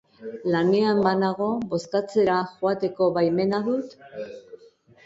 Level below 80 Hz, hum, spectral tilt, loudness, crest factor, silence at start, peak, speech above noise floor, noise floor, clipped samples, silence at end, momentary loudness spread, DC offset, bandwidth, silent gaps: -64 dBFS; none; -7 dB/octave; -23 LUFS; 18 dB; 0.2 s; -6 dBFS; 30 dB; -54 dBFS; under 0.1%; 0.5 s; 17 LU; under 0.1%; 8 kHz; none